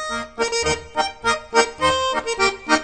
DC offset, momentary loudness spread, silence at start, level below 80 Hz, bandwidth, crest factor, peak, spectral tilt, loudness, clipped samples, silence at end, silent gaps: under 0.1%; 5 LU; 0 s; -44 dBFS; 9.4 kHz; 20 dB; -2 dBFS; -2 dB/octave; -20 LUFS; under 0.1%; 0 s; none